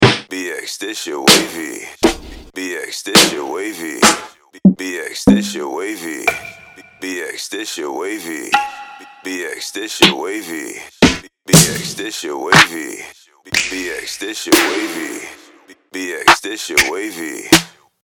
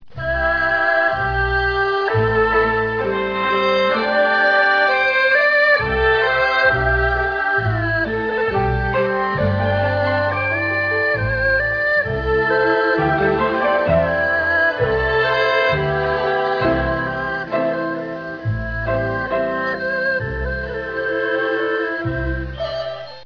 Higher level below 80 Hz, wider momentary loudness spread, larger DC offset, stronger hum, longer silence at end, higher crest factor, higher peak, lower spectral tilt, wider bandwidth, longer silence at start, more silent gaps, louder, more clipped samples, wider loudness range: second, -42 dBFS vs -34 dBFS; first, 17 LU vs 8 LU; neither; neither; first, 0.35 s vs 0 s; about the same, 18 dB vs 14 dB; first, 0 dBFS vs -4 dBFS; second, -3 dB/octave vs -7 dB/octave; first, over 20 kHz vs 5.4 kHz; about the same, 0 s vs 0 s; neither; first, -15 LUFS vs -18 LUFS; neither; about the same, 7 LU vs 7 LU